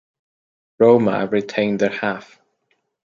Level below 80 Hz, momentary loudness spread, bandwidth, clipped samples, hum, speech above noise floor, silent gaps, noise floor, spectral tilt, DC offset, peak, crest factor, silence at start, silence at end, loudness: -64 dBFS; 11 LU; 7.4 kHz; under 0.1%; none; 52 dB; none; -69 dBFS; -7 dB/octave; under 0.1%; -2 dBFS; 18 dB; 0.8 s; 0.8 s; -18 LUFS